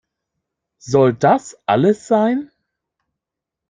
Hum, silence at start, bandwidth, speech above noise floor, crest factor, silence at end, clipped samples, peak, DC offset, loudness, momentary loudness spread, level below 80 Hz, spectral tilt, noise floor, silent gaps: none; 0.85 s; 9.6 kHz; 68 dB; 16 dB; 1.25 s; under 0.1%; -2 dBFS; under 0.1%; -17 LUFS; 6 LU; -60 dBFS; -6.5 dB/octave; -84 dBFS; none